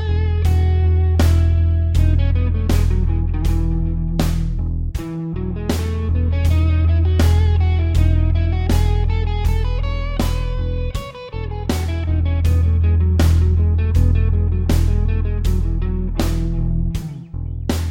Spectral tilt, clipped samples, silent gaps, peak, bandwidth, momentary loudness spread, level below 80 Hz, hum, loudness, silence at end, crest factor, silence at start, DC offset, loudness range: -7 dB/octave; under 0.1%; none; -4 dBFS; 16 kHz; 9 LU; -20 dBFS; none; -19 LUFS; 0 s; 12 dB; 0 s; 0.8%; 5 LU